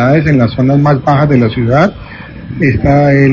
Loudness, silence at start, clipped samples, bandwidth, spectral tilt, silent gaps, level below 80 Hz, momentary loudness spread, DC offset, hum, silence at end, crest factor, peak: -10 LUFS; 0 s; under 0.1%; 7 kHz; -9 dB/octave; none; -30 dBFS; 17 LU; under 0.1%; none; 0 s; 10 dB; 0 dBFS